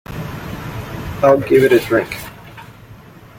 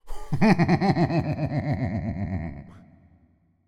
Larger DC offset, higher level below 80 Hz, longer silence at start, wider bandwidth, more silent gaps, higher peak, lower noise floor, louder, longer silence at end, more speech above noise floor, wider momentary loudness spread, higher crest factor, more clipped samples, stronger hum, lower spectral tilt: neither; about the same, -42 dBFS vs -44 dBFS; about the same, 0.1 s vs 0.05 s; first, 17 kHz vs 10.5 kHz; neither; first, -2 dBFS vs -6 dBFS; second, -40 dBFS vs -62 dBFS; first, -15 LUFS vs -25 LUFS; second, 0.35 s vs 0.9 s; second, 27 dB vs 39 dB; first, 20 LU vs 13 LU; about the same, 16 dB vs 20 dB; neither; neither; second, -6.5 dB/octave vs -8 dB/octave